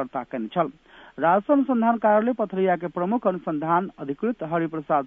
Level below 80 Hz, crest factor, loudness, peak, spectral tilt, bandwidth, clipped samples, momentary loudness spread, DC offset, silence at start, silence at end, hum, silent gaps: -64 dBFS; 16 dB; -24 LUFS; -8 dBFS; -10 dB/octave; 3.8 kHz; under 0.1%; 9 LU; under 0.1%; 0 s; 0 s; none; none